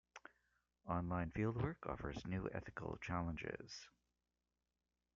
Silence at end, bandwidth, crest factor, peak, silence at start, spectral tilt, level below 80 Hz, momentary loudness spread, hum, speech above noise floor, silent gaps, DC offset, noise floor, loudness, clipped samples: 1.25 s; 7.4 kHz; 20 dB; -26 dBFS; 0.15 s; -6.5 dB/octave; -62 dBFS; 19 LU; 60 Hz at -65 dBFS; over 46 dB; none; under 0.1%; under -90 dBFS; -45 LUFS; under 0.1%